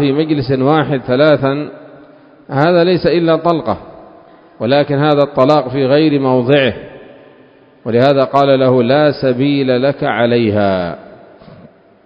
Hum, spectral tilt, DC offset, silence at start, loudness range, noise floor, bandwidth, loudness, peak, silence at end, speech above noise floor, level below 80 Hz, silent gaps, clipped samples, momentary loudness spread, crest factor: none; -9 dB/octave; under 0.1%; 0 s; 2 LU; -44 dBFS; 7.4 kHz; -13 LUFS; 0 dBFS; 0.5 s; 33 dB; -48 dBFS; none; under 0.1%; 10 LU; 14 dB